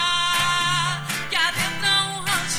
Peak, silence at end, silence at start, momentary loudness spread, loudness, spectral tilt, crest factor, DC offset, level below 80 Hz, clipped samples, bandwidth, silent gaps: -8 dBFS; 0 s; 0 s; 4 LU; -21 LUFS; -1.5 dB/octave; 14 dB; under 0.1%; -50 dBFS; under 0.1%; over 20 kHz; none